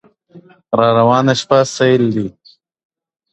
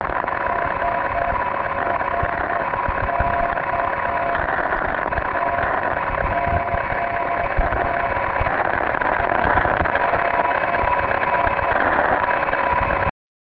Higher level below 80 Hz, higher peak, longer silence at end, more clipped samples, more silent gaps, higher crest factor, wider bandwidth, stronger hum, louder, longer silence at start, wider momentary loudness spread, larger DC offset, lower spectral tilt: second, -54 dBFS vs -34 dBFS; about the same, 0 dBFS vs -2 dBFS; first, 1 s vs 0.3 s; neither; neither; about the same, 16 dB vs 20 dB; first, 8.4 kHz vs 5.6 kHz; neither; first, -13 LUFS vs -20 LUFS; first, 0.35 s vs 0 s; first, 9 LU vs 4 LU; neither; second, -5.5 dB/octave vs -9 dB/octave